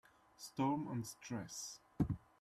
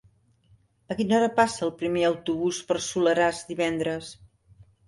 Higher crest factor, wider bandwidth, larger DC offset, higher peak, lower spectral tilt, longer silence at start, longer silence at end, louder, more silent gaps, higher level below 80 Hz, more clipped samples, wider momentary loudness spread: about the same, 20 dB vs 20 dB; first, 13.5 kHz vs 11.5 kHz; neither; second, -24 dBFS vs -8 dBFS; about the same, -5.5 dB/octave vs -4.5 dB/octave; second, 0.4 s vs 0.9 s; second, 0.25 s vs 0.65 s; second, -43 LUFS vs -25 LUFS; neither; about the same, -62 dBFS vs -60 dBFS; neither; first, 11 LU vs 8 LU